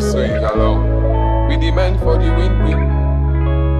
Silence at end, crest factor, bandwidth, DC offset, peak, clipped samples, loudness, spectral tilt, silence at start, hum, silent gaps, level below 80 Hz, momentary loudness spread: 0 s; 12 dB; 9.8 kHz; under 0.1%; -2 dBFS; under 0.1%; -16 LUFS; -7.5 dB/octave; 0 s; none; none; -16 dBFS; 1 LU